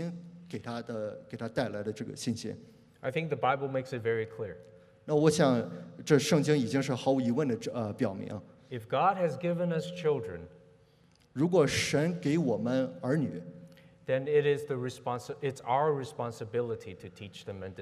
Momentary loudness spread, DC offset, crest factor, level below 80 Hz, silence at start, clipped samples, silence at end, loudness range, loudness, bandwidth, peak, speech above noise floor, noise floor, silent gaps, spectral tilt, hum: 17 LU; under 0.1%; 20 dB; -68 dBFS; 0 s; under 0.1%; 0 s; 6 LU; -31 LUFS; 14.5 kHz; -10 dBFS; 33 dB; -64 dBFS; none; -6 dB/octave; none